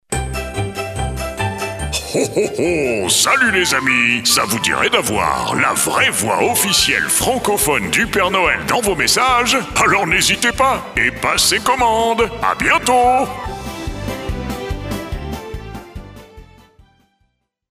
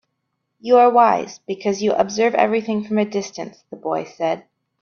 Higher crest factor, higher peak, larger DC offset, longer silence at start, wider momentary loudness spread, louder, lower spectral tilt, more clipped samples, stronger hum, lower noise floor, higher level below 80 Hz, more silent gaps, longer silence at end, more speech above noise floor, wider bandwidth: about the same, 16 dB vs 18 dB; about the same, -2 dBFS vs -2 dBFS; neither; second, 0.1 s vs 0.65 s; second, 13 LU vs 17 LU; first, -15 LUFS vs -19 LUFS; second, -2.5 dB/octave vs -5 dB/octave; neither; neither; second, -65 dBFS vs -75 dBFS; first, -34 dBFS vs -64 dBFS; neither; first, 1.25 s vs 0.4 s; second, 50 dB vs 56 dB; first, 16 kHz vs 7 kHz